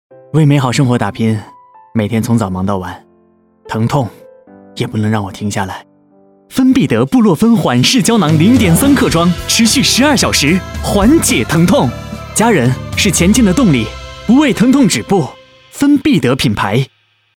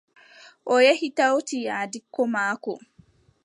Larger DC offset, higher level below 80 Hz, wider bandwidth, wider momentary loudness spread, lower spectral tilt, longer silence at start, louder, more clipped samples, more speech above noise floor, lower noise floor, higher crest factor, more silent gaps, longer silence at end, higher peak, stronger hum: neither; first, -32 dBFS vs -74 dBFS; first, 17.5 kHz vs 11 kHz; second, 12 LU vs 15 LU; first, -5 dB/octave vs -3 dB/octave; second, 0.35 s vs 0.65 s; first, -11 LUFS vs -23 LUFS; neither; first, 40 dB vs 35 dB; second, -51 dBFS vs -58 dBFS; second, 12 dB vs 20 dB; neither; second, 0.5 s vs 0.65 s; first, 0 dBFS vs -4 dBFS; neither